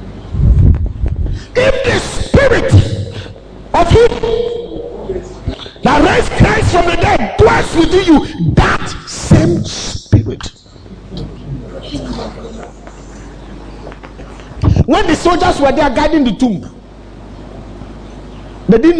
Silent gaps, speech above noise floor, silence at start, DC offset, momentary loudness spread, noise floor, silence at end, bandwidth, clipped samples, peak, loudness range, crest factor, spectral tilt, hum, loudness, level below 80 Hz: none; 25 dB; 0 s; under 0.1%; 22 LU; -35 dBFS; 0 s; 10.5 kHz; 0.2%; 0 dBFS; 11 LU; 12 dB; -6 dB/octave; none; -12 LUFS; -22 dBFS